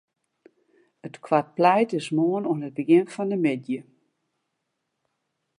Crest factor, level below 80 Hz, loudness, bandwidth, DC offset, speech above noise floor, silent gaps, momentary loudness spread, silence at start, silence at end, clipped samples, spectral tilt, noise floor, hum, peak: 22 dB; -80 dBFS; -23 LUFS; 10.5 kHz; under 0.1%; 56 dB; none; 14 LU; 1.05 s; 1.75 s; under 0.1%; -7 dB/octave; -79 dBFS; none; -4 dBFS